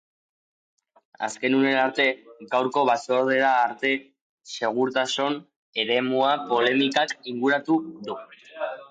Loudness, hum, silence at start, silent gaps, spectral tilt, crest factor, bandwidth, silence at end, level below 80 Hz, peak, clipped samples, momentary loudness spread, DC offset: -23 LUFS; none; 1.2 s; 4.21-4.38 s, 5.56-5.73 s; -4 dB/octave; 16 dB; 9.2 kHz; 0.05 s; -80 dBFS; -10 dBFS; under 0.1%; 13 LU; under 0.1%